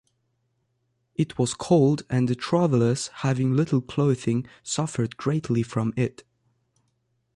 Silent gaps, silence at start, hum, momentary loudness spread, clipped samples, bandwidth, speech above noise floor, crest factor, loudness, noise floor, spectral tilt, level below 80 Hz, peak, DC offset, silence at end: none; 1.2 s; none; 8 LU; under 0.1%; 11.5 kHz; 50 dB; 16 dB; -24 LUFS; -73 dBFS; -6.5 dB/octave; -58 dBFS; -8 dBFS; under 0.1%; 1.3 s